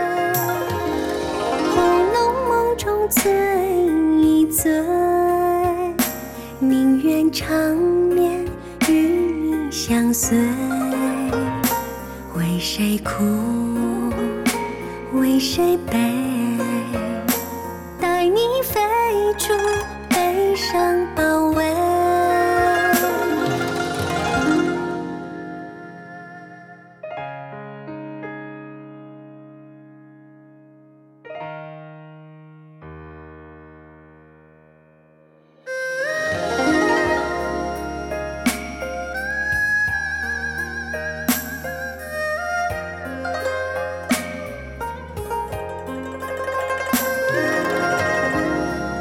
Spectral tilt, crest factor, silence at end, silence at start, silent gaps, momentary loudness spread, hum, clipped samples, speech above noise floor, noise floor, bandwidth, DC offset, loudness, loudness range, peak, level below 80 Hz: -4.5 dB/octave; 16 dB; 0 s; 0 s; none; 16 LU; none; under 0.1%; 34 dB; -53 dBFS; 17.5 kHz; under 0.1%; -20 LUFS; 18 LU; -6 dBFS; -42 dBFS